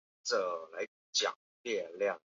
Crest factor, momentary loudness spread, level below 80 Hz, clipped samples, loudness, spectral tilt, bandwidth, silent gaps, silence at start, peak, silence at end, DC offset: 18 dB; 10 LU; -86 dBFS; under 0.1%; -35 LUFS; 1 dB/octave; 7.6 kHz; 0.88-1.13 s, 1.36-1.64 s; 0.25 s; -18 dBFS; 0.1 s; under 0.1%